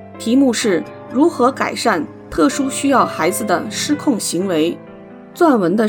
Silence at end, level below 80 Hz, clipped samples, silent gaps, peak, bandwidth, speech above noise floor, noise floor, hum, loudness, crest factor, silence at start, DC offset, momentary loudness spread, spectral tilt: 0 s; -50 dBFS; under 0.1%; none; -2 dBFS; 19 kHz; 21 dB; -37 dBFS; none; -17 LUFS; 16 dB; 0 s; under 0.1%; 7 LU; -4 dB/octave